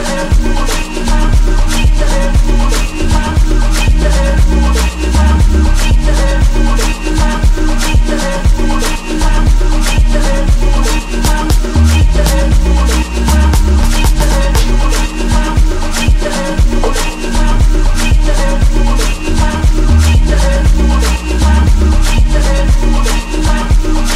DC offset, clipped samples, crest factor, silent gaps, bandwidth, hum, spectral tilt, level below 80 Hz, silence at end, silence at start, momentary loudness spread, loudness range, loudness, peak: under 0.1%; under 0.1%; 8 dB; none; 14.5 kHz; none; -5 dB/octave; -10 dBFS; 0 s; 0 s; 4 LU; 2 LU; -12 LUFS; 0 dBFS